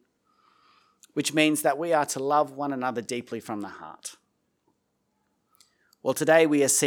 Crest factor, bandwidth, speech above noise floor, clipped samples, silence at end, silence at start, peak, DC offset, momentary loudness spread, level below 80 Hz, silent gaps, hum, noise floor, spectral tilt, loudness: 22 dB; 19 kHz; 50 dB; under 0.1%; 0 s; 1.15 s; -6 dBFS; under 0.1%; 19 LU; -82 dBFS; none; none; -75 dBFS; -3 dB/octave; -25 LUFS